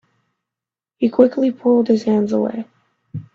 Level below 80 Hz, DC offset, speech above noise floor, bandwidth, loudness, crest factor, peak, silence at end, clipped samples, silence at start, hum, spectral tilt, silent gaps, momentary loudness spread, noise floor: -62 dBFS; under 0.1%; 71 dB; 7.2 kHz; -17 LUFS; 18 dB; 0 dBFS; 0.15 s; under 0.1%; 1 s; none; -8 dB/octave; none; 19 LU; -87 dBFS